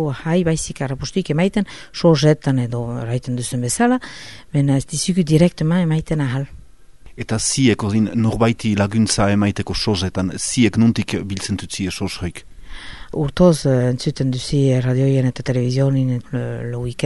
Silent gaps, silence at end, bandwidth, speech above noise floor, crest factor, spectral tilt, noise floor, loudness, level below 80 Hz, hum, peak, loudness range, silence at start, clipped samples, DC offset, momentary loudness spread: none; 0 s; 11.5 kHz; 26 dB; 18 dB; -5.5 dB/octave; -44 dBFS; -19 LUFS; -40 dBFS; none; 0 dBFS; 3 LU; 0 s; under 0.1%; 0.9%; 10 LU